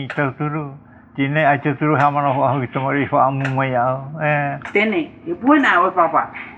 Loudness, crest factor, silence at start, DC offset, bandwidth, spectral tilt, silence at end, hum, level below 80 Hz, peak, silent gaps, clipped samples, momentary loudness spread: -18 LUFS; 16 dB; 0 s; under 0.1%; 7.8 kHz; -8 dB/octave; 0 s; none; -58 dBFS; -2 dBFS; none; under 0.1%; 9 LU